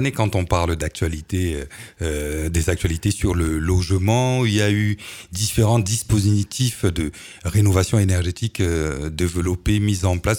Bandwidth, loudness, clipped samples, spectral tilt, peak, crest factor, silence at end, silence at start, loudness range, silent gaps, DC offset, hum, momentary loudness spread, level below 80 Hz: 17.5 kHz; -21 LUFS; under 0.1%; -5.5 dB/octave; -2 dBFS; 18 dB; 0 s; 0 s; 3 LU; none; under 0.1%; none; 8 LU; -32 dBFS